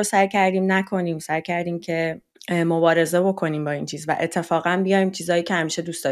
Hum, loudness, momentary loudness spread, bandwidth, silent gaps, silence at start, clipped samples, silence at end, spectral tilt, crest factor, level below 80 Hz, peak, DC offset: none; -22 LUFS; 8 LU; 14.5 kHz; none; 0 s; under 0.1%; 0 s; -5 dB/octave; 18 dB; -66 dBFS; -4 dBFS; under 0.1%